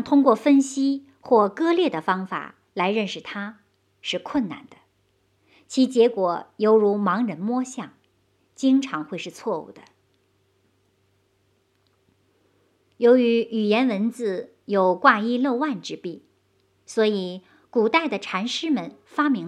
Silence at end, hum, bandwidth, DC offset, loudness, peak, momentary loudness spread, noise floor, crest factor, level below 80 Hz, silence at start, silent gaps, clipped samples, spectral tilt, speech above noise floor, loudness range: 0 s; none; 10.5 kHz; under 0.1%; -22 LUFS; -2 dBFS; 15 LU; -66 dBFS; 22 dB; -72 dBFS; 0 s; none; under 0.1%; -5 dB/octave; 45 dB; 8 LU